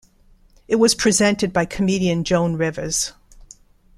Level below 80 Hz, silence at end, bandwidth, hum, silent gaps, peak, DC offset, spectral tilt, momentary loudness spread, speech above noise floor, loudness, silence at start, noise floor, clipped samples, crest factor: -46 dBFS; 0.85 s; 15 kHz; none; none; -4 dBFS; under 0.1%; -4 dB/octave; 7 LU; 34 dB; -19 LUFS; 0.7 s; -53 dBFS; under 0.1%; 18 dB